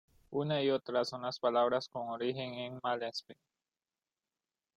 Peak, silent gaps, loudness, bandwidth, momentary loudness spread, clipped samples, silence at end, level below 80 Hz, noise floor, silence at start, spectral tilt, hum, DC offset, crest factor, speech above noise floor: -18 dBFS; none; -35 LUFS; 11 kHz; 10 LU; under 0.1%; 1.45 s; -78 dBFS; under -90 dBFS; 0.3 s; -5.5 dB/octave; none; under 0.1%; 20 dB; over 55 dB